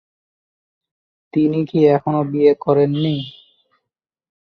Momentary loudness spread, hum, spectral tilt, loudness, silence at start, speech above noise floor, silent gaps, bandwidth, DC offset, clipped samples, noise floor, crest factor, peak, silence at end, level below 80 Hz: 9 LU; none; -9.5 dB/octave; -17 LUFS; 1.35 s; 66 dB; none; 5.2 kHz; under 0.1%; under 0.1%; -82 dBFS; 16 dB; -2 dBFS; 1.1 s; -62 dBFS